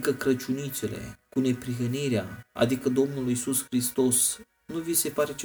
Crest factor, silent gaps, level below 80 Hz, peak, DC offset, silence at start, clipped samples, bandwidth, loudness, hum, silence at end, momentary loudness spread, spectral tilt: 20 dB; none; -60 dBFS; -8 dBFS; under 0.1%; 0 s; under 0.1%; over 20 kHz; -27 LUFS; none; 0 s; 11 LU; -4 dB/octave